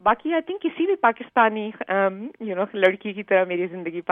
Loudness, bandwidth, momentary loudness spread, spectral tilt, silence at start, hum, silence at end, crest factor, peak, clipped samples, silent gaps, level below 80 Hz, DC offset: -23 LUFS; 3.9 kHz; 10 LU; -7.5 dB/octave; 0.05 s; none; 0.1 s; 20 dB; -4 dBFS; under 0.1%; none; -62 dBFS; under 0.1%